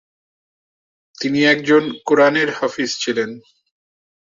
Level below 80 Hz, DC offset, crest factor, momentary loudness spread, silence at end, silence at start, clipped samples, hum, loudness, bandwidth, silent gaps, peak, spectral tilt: -64 dBFS; under 0.1%; 18 dB; 9 LU; 0.9 s; 1.2 s; under 0.1%; none; -17 LUFS; 7.6 kHz; none; -2 dBFS; -4 dB/octave